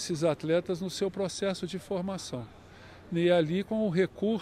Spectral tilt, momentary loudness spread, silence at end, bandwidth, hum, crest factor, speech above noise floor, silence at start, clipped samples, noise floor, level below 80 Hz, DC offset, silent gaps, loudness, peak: -5.5 dB/octave; 12 LU; 0 s; 14.5 kHz; none; 16 dB; 21 dB; 0 s; under 0.1%; -51 dBFS; -62 dBFS; under 0.1%; none; -30 LUFS; -14 dBFS